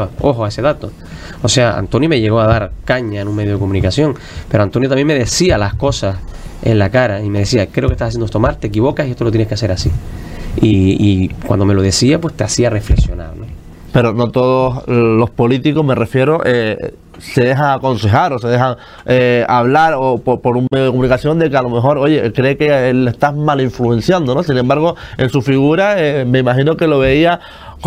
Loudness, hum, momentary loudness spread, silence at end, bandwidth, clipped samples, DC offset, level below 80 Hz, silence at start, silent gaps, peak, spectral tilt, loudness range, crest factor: -13 LUFS; none; 8 LU; 0 s; 14.5 kHz; under 0.1%; under 0.1%; -28 dBFS; 0 s; none; 0 dBFS; -6 dB/octave; 2 LU; 12 dB